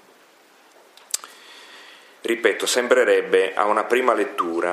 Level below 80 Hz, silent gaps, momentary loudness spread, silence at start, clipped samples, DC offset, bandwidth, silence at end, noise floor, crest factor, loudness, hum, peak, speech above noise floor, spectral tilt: -80 dBFS; none; 22 LU; 1.15 s; under 0.1%; under 0.1%; 15.5 kHz; 0 s; -53 dBFS; 20 dB; -20 LUFS; none; -2 dBFS; 34 dB; -1.5 dB/octave